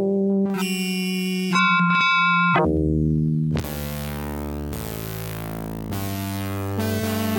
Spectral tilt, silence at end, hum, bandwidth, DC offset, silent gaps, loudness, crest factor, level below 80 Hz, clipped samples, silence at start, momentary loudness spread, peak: -5.5 dB/octave; 0 s; none; 17.5 kHz; under 0.1%; none; -22 LUFS; 16 dB; -38 dBFS; under 0.1%; 0 s; 13 LU; -6 dBFS